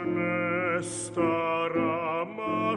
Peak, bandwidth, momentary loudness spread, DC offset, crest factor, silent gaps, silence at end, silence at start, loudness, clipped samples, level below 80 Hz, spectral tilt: -14 dBFS; 11.5 kHz; 4 LU; under 0.1%; 14 dB; none; 0 s; 0 s; -28 LUFS; under 0.1%; -64 dBFS; -5 dB/octave